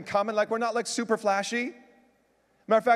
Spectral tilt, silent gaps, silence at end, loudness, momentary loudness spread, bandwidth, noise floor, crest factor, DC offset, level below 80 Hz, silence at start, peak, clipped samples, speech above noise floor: -3.5 dB/octave; none; 0 s; -27 LUFS; 5 LU; 14 kHz; -67 dBFS; 18 dB; under 0.1%; -76 dBFS; 0 s; -10 dBFS; under 0.1%; 41 dB